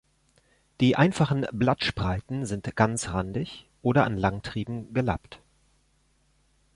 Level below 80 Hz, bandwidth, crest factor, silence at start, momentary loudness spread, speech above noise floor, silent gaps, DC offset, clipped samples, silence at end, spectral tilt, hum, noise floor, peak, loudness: -48 dBFS; 11.5 kHz; 22 dB; 0.8 s; 11 LU; 41 dB; none; under 0.1%; under 0.1%; 1.4 s; -6 dB/octave; none; -67 dBFS; -6 dBFS; -27 LUFS